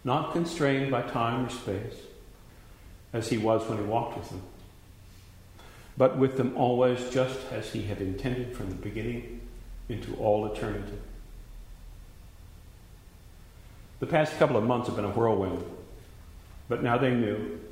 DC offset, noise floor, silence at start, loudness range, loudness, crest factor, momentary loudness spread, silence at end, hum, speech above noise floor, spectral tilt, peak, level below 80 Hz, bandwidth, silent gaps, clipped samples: under 0.1%; -51 dBFS; 0.05 s; 6 LU; -29 LUFS; 22 dB; 24 LU; 0 s; none; 23 dB; -6.5 dB/octave; -8 dBFS; -48 dBFS; 16 kHz; none; under 0.1%